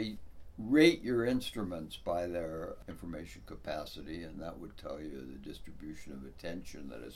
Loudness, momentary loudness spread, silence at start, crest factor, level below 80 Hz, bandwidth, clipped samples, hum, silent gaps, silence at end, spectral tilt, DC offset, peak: -35 LUFS; 20 LU; 0 s; 24 dB; -54 dBFS; 15.5 kHz; under 0.1%; none; none; 0 s; -5.5 dB/octave; under 0.1%; -12 dBFS